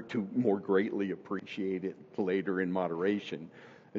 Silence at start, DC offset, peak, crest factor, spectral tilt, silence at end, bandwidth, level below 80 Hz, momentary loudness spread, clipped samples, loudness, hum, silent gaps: 0 s; under 0.1%; -14 dBFS; 18 dB; -5.5 dB/octave; 0 s; 7.4 kHz; -80 dBFS; 10 LU; under 0.1%; -33 LUFS; none; none